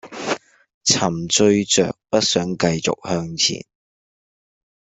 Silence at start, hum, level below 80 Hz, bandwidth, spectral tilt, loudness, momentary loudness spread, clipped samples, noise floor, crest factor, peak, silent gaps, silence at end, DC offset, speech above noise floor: 0.05 s; none; -56 dBFS; 8.4 kHz; -3 dB/octave; -19 LUFS; 10 LU; under 0.1%; under -90 dBFS; 18 dB; -2 dBFS; 0.74-0.81 s; 1.3 s; under 0.1%; over 71 dB